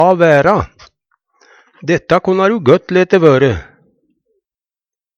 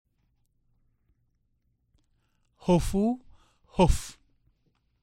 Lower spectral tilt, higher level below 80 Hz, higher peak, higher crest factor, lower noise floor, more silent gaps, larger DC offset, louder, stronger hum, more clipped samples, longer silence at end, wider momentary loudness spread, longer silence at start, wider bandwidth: about the same, -7 dB/octave vs -6.5 dB/octave; about the same, -42 dBFS vs -38 dBFS; first, 0 dBFS vs -8 dBFS; second, 14 dB vs 22 dB; first, under -90 dBFS vs -73 dBFS; neither; neither; first, -11 LUFS vs -27 LUFS; neither; neither; first, 1.55 s vs 0.9 s; about the same, 10 LU vs 12 LU; second, 0 s vs 2.65 s; second, 7.8 kHz vs 16 kHz